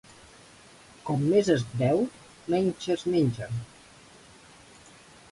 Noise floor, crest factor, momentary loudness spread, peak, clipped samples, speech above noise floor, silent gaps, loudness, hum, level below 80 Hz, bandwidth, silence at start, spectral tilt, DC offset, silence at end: -53 dBFS; 18 dB; 14 LU; -10 dBFS; under 0.1%; 27 dB; none; -27 LUFS; none; -60 dBFS; 11.5 kHz; 1.05 s; -7 dB/octave; under 0.1%; 1.65 s